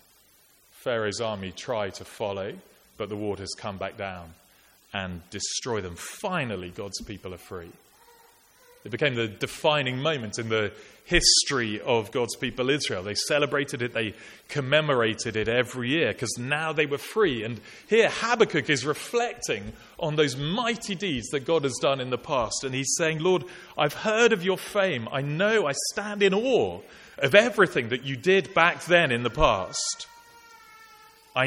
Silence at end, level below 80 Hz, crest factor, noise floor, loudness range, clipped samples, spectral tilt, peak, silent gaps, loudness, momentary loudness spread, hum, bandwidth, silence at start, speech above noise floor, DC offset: 0 s; -48 dBFS; 24 dB; -60 dBFS; 10 LU; under 0.1%; -3.5 dB/octave; -4 dBFS; none; -25 LUFS; 14 LU; none; 16.5 kHz; 0.8 s; 34 dB; under 0.1%